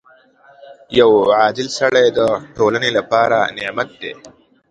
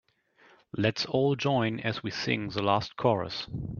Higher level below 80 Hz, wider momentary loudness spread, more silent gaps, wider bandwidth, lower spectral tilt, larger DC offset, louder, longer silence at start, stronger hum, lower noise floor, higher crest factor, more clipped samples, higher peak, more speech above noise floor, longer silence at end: about the same, -54 dBFS vs -58 dBFS; first, 11 LU vs 6 LU; neither; first, 9.2 kHz vs 7.2 kHz; second, -4 dB/octave vs -6 dB/octave; neither; first, -15 LUFS vs -29 LUFS; about the same, 0.7 s vs 0.75 s; neither; second, -49 dBFS vs -62 dBFS; about the same, 16 dB vs 20 dB; neither; first, 0 dBFS vs -10 dBFS; about the same, 33 dB vs 33 dB; first, 0.4 s vs 0 s